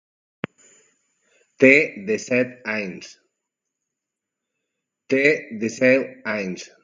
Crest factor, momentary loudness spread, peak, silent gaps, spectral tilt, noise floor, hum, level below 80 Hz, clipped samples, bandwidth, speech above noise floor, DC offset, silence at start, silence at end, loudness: 24 dB; 21 LU; 0 dBFS; none; -5 dB/octave; -84 dBFS; none; -68 dBFS; under 0.1%; 7.6 kHz; 64 dB; under 0.1%; 1.6 s; 0.15 s; -20 LUFS